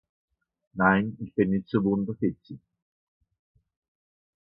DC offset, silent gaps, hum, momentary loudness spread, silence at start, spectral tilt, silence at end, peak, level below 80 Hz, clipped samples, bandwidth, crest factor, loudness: under 0.1%; none; none; 20 LU; 0.75 s; -11.5 dB/octave; 1.9 s; -6 dBFS; -58 dBFS; under 0.1%; 5.2 kHz; 22 dB; -26 LUFS